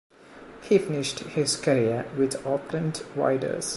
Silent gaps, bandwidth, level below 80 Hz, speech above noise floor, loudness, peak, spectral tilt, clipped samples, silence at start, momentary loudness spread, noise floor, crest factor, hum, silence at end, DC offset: none; 12 kHz; -62 dBFS; 21 dB; -26 LUFS; -8 dBFS; -4.5 dB/octave; under 0.1%; 0.3 s; 7 LU; -47 dBFS; 20 dB; none; 0 s; under 0.1%